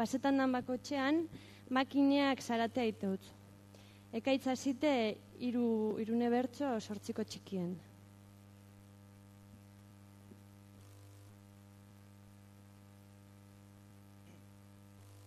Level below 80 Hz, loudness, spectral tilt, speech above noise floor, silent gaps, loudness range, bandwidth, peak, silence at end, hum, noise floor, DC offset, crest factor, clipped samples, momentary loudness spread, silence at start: -76 dBFS; -36 LUFS; -5.5 dB/octave; 24 dB; none; 23 LU; 13.5 kHz; -20 dBFS; 0 s; 50 Hz at -60 dBFS; -58 dBFS; under 0.1%; 20 dB; under 0.1%; 26 LU; 0 s